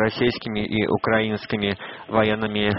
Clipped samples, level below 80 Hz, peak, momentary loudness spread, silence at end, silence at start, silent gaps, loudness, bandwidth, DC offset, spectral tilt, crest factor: under 0.1%; -50 dBFS; -4 dBFS; 5 LU; 0 s; 0 s; none; -23 LUFS; 5.8 kHz; under 0.1%; -4 dB/octave; 20 dB